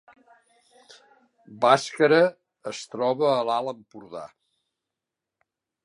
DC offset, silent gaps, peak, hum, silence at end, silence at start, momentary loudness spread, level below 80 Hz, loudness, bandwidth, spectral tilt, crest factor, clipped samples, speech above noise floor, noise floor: under 0.1%; none; -2 dBFS; none; 1.6 s; 1.5 s; 21 LU; -80 dBFS; -23 LUFS; 11.5 kHz; -4.5 dB/octave; 24 dB; under 0.1%; 64 dB; -87 dBFS